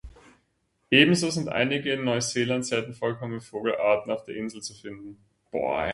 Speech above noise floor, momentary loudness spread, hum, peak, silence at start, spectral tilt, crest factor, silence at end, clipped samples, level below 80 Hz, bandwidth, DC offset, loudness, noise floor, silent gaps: 46 dB; 18 LU; none; -2 dBFS; 0.05 s; -4 dB/octave; 24 dB; 0 s; under 0.1%; -56 dBFS; 11.5 kHz; under 0.1%; -25 LUFS; -72 dBFS; none